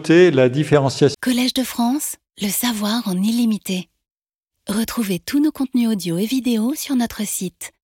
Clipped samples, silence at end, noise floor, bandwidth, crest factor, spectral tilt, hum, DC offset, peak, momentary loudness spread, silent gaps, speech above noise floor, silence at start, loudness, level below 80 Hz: under 0.1%; 0.15 s; -81 dBFS; 17 kHz; 18 dB; -5 dB/octave; none; under 0.1%; -2 dBFS; 10 LU; none; 63 dB; 0 s; -19 LUFS; -54 dBFS